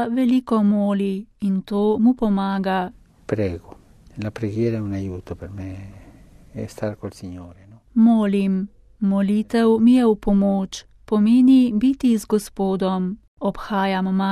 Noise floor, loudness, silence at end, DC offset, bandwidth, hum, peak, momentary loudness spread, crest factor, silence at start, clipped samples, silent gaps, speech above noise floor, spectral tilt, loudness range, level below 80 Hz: -46 dBFS; -20 LUFS; 0 s; under 0.1%; 13 kHz; none; -6 dBFS; 18 LU; 14 dB; 0 s; under 0.1%; 13.28-13.37 s; 27 dB; -7.5 dB/octave; 11 LU; -46 dBFS